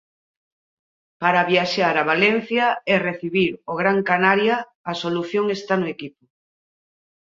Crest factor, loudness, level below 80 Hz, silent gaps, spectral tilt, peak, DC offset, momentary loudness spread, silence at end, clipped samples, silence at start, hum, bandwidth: 20 dB; -20 LUFS; -66 dBFS; 4.75-4.84 s; -5.5 dB/octave; -2 dBFS; under 0.1%; 8 LU; 1.1 s; under 0.1%; 1.2 s; none; 7.6 kHz